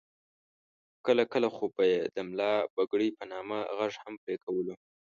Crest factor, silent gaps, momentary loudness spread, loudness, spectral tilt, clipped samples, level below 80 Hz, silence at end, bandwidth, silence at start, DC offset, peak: 20 dB; 2.70-2.77 s, 4.18-4.27 s, 4.43-4.47 s; 11 LU; -31 LUFS; -5.5 dB/octave; under 0.1%; -76 dBFS; 0.4 s; 7.2 kHz; 1.05 s; under 0.1%; -12 dBFS